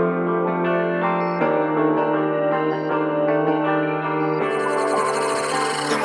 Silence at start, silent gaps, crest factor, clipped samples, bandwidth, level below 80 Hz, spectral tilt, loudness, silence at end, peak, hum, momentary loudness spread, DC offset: 0 s; none; 14 dB; under 0.1%; 13.5 kHz; -68 dBFS; -5.5 dB/octave; -21 LUFS; 0 s; -6 dBFS; none; 2 LU; under 0.1%